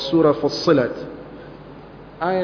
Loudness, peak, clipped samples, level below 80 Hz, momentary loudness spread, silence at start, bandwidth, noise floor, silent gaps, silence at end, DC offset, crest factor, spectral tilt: -19 LUFS; -2 dBFS; under 0.1%; -52 dBFS; 23 LU; 0 s; 5.4 kHz; -40 dBFS; none; 0 s; under 0.1%; 18 dB; -6.5 dB/octave